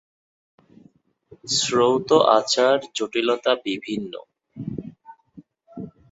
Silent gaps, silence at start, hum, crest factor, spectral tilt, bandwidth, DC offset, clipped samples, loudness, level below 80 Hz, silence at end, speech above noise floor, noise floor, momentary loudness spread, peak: none; 1.45 s; none; 22 dB; -3.5 dB/octave; 8 kHz; under 0.1%; under 0.1%; -20 LUFS; -62 dBFS; 0.25 s; 37 dB; -57 dBFS; 21 LU; -2 dBFS